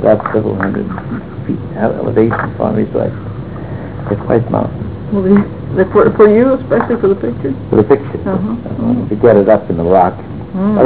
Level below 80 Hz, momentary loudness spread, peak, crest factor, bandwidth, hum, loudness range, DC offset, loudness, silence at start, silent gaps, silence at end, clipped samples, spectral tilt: -36 dBFS; 14 LU; 0 dBFS; 12 dB; 4 kHz; none; 5 LU; 1%; -13 LUFS; 0 s; none; 0 s; under 0.1%; -12.5 dB/octave